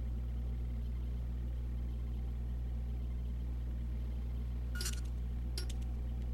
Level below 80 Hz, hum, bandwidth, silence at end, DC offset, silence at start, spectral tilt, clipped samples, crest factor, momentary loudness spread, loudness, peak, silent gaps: -38 dBFS; 60 Hz at -40 dBFS; 14 kHz; 0 s; under 0.1%; 0 s; -5.5 dB/octave; under 0.1%; 14 dB; 2 LU; -41 LUFS; -24 dBFS; none